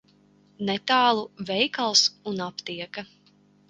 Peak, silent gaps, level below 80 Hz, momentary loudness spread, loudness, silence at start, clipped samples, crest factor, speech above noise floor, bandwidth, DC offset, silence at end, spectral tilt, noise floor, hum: -6 dBFS; none; -70 dBFS; 15 LU; -24 LUFS; 0.6 s; under 0.1%; 20 dB; 34 dB; 11 kHz; under 0.1%; 0.65 s; -2 dB/octave; -60 dBFS; 50 Hz at -50 dBFS